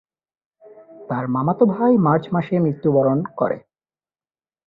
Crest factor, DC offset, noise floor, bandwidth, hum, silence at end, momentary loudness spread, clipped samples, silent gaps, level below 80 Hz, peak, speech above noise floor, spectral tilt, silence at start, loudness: 18 dB; under 0.1%; under -90 dBFS; 4.2 kHz; none; 1.1 s; 9 LU; under 0.1%; none; -60 dBFS; -4 dBFS; over 72 dB; -11.5 dB/octave; 0.7 s; -19 LUFS